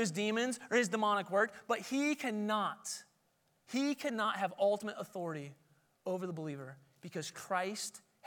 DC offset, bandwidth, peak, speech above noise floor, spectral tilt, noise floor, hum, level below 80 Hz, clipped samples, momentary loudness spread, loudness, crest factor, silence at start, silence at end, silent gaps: under 0.1%; 19 kHz; -18 dBFS; 40 dB; -4 dB/octave; -76 dBFS; none; under -90 dBFS; under 0.1%; 13 LU; -36 LUFS; 20 dB; 0 s; 0.3 s; none